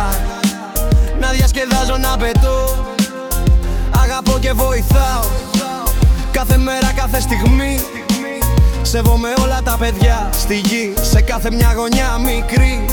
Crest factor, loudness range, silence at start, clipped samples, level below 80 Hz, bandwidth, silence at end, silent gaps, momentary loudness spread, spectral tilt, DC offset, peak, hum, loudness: 12 dB; 1 LU; 0 s; under 0.1%; -16 dBFS; 19 kHz; 0 s; none; 5 LU; -5 dB/octave; under 0.1%; -2 dBFS; none; -15 LUFS